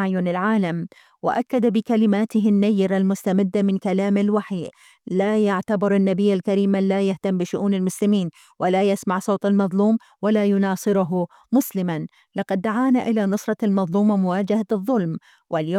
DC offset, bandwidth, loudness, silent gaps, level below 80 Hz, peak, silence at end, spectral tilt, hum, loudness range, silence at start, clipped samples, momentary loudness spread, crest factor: under 0.1%; 14.5 kHz; -21 LUFS; none; -70 dBFS; -8 dBFS; 0 s; -7 dB/octave; none; 2 LU; 0 s; under 0.1%; 7 LU; 12 dB